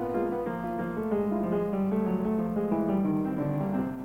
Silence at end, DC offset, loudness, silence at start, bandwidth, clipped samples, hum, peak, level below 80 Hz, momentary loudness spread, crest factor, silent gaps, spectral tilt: 0 s; under 0.1%; -29 LUFS; 0 s; 16.5 kHz; under 0.1%; none; -16 dBFS; -54 dBFS; 5 LU; 12 dB; none; -10 dB/octave